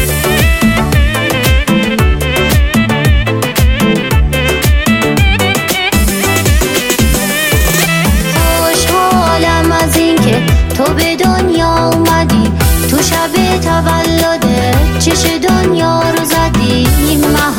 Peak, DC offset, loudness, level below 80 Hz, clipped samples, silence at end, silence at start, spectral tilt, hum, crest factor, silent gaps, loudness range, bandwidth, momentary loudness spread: 0 dBFS; under 0.1%; -10 LUFS; -16 dBFS; under 0.1%; 0 s; 0 s; -4.5 dB/octave; none; 10 dB; none; 1 LU; 17 kHz; 2 LU